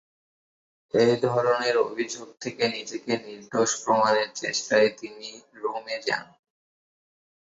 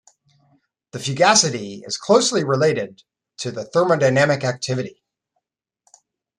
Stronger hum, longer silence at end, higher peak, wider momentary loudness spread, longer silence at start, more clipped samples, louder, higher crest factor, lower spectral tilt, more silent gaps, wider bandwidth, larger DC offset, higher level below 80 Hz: neither; second, 1.3 s vs 1.5 s; second, -8 dBFS vs -2 dBFS; second, 13 LU vs 16 LU; about the same, 0.95 s vs 0.95 s; neither; second, -25 LUFS vs -19 LUFS; about the same, 18 dB vs 20 dB; about the same, -3.5 dB/octave vs -3.5 dB/octave; neither; second, 8 kHz vs 12 kHz; neither; second, -72 dBFS vs -62 dBFS